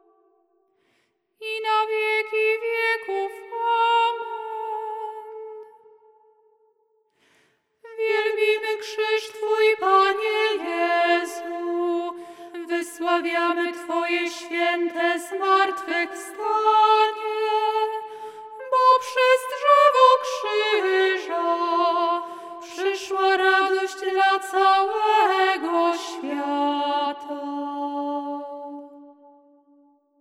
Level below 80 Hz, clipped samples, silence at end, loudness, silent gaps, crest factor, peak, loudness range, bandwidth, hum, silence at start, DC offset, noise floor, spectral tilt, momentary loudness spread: -84 dBFS; under 0.1%; 1.1 s; -22 LUFS; none; 20 dB; -2 dBFS; 9 LU; 15.5 kHz; none; 1.4 s; under 0.1%; -69 dBFS; -1 dB/octave; 14 LU